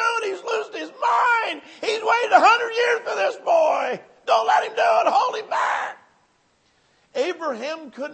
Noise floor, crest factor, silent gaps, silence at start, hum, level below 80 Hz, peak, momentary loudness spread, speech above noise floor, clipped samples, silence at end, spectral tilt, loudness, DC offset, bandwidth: -63 dBFS; 20 dB; none; 0 s; none; -82 dBFS; 0 dBFS; 12 LU; 43 dB; under 0.1%; 0 s; -1.5 dB/octave; -21 LUFS; under 0.1%; 8.8 kHz